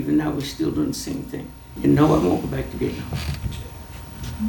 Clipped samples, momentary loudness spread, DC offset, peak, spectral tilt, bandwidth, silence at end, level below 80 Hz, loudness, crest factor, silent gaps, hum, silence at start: under 0.1%; 17 LU; under 0.1%; -2 dBFS; -6.5 dB/octave; 19 kHz; 0 s; -38 dBFS; -23 LUFS; 20 dB; none; none; 0 s